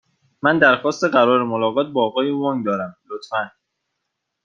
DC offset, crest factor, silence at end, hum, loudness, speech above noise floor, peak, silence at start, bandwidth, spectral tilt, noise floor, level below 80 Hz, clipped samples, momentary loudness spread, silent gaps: under 0.1%; 18 dB; 0.95 s; none; -19 LUFS; 59 dB; -2 dBFS; 0.45 s; 7.4 kHz; -5.5 dB/octave; -78 dBFS; -66 dBFS; under 0.1%; 11 LU; none